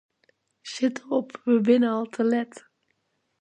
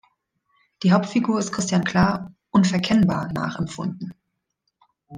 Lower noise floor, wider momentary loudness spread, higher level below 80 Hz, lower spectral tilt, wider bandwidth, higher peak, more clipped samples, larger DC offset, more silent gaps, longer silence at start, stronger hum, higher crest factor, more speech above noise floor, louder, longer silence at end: about the same, -74 dBFS vs -76 dBFS; first, 16 LU vs 11 LU; second, -78 dBFS vs -52 dBFS; about the same, -5.5 dB/octave vs -5.5 dB/octave; about the same, 9.2 kHz vs 9.8 kHz; about the same, -8 dBFS vs -6 dBFS; neither; neither; neither; second, 0.65 s vs 0.8 s; neither; about the same, 18 dB vs 18 dB; second, 50 dB vs 55 dB; about the same, -24 LUFS vs -22 LUFS; first, 0.85 s vs 0 s